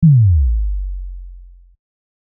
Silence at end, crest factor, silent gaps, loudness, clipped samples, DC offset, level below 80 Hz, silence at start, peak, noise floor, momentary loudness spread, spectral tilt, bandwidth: 0.85 s; 12 dB; none; -15 LUFS; under 0.1%; under 0.1%; -22 dBFS; 0 s; -4 dBFS; -39 dBFS; 23 LU; -31 dB/octave; 0.3 kHz